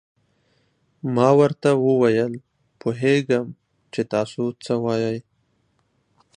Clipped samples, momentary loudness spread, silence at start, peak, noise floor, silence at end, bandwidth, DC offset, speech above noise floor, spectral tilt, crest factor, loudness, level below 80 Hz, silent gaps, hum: under 0.1%; 15 LU; 1.05 s; -2 dBFS; -67 dBFS; 1.15 s; 10.5 kHz; under 0.1%; 47 dB; -7 dB/octave; 20 dB; -21 LUFS; -66 dBFS; none; none